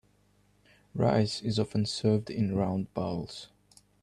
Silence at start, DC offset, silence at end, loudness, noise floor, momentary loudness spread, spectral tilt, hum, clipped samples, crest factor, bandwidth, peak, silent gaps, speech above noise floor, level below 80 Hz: 0.95 s; under 0.1%; 0.55 s; -30 LUFS; -66 dBFS; 15 LU; -6.5 dB/octave; 50 Hz at -50 dBFS; under 0.1%; 18 dB; 11.5 kHz; -14 dBFS; none; 37 dB; -60 dBFS